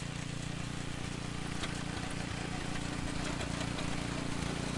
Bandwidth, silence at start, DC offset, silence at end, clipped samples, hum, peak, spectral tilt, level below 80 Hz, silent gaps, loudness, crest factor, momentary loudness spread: 11.5 kHz; 0 s; under 0.1%; 0 s; under 0.1%; none; -24 dBFS; -4.5 dB/octave; -48 dBFS; none; -38 LUFS; 14 dB; 3 LU